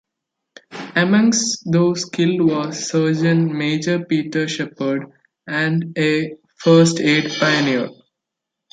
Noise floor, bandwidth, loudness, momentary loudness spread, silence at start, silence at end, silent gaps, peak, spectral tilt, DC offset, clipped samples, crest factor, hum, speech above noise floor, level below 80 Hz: -82 dBFS; 9.4 kHz; -18 LUFS; 9 LU; 0.7 s; 0.8 s; none; -2 dBFS; -5 dB/octave; under 0.1%; under 0.1%; 16 dB; none; 65 dB; -64 dBFS